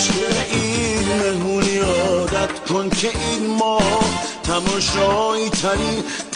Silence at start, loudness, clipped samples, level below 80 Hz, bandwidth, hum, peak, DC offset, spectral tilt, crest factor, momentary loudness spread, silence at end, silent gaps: 0 s; -19 LUFS; under 0.1%; -38 dBFS; 11.5 kHz; none; -6 dBFS; under 0.1%; -3.5 dB/octave; 12 dB; 4 LU; 0 s; none